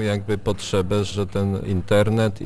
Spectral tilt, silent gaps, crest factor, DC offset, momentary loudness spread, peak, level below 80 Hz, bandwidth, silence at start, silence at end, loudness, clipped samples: -6.5 dB/octave; none; 16 dB; under 0.1%; 6 LU; -6 dBFS; -42 dBFS; 11 kHz; 0 s; 0 s; -22 LUFS; under 0.1%